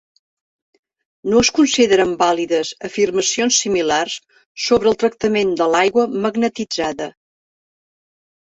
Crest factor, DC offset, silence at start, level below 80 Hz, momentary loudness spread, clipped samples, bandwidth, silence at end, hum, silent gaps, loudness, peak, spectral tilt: 16 dB; under 0.1%; 1.25 s; -52 dBFS; 10 LU; under 0.1%; 8.4 kHz; 1.45 s; none; 4.46-4.55 s; -17 LUFS; -2 dBFS; -3 dB/octave